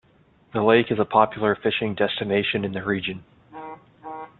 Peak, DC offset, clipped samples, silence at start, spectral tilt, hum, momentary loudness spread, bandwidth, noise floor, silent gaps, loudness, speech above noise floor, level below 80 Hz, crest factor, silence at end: -2 dBFS; under 0.1%; under 0.1%; 0.55 s; -9.5 dB/octave; none; 20 LU; 4.3 kHz; -58 dBFS; none; -22 LUFS; 36 dB; -60 dBFS; 22 dB; 0.1 s